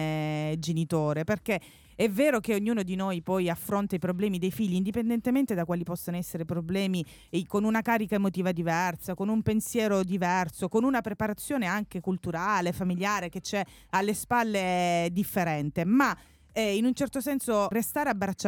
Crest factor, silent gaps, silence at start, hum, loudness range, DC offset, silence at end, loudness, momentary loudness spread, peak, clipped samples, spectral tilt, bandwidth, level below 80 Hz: 16 dB; none; 0 s; none; 2 LU; under 0.1%; 0 s; -29 LUFS; 6 LU; -12 dBFS; under 0.1%; -5.5 dB/octave; 18 kHz; -58 dBFS